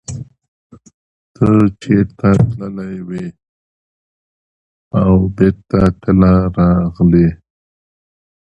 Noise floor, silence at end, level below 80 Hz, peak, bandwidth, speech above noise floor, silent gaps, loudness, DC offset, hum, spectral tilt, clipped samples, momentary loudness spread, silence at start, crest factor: under -90 dBFS; 1.2 s; -32 dBFS; 0 dBFS; 8.4 kHz; over 78 dB; 0.48-0.70 s, 0.94-1.35 s, 3.49-4.91 s; -13 LUFS; under 0.1%; none; -9 dB/octave; under 0.1%; 14 LU; 0.1 s; 14 dB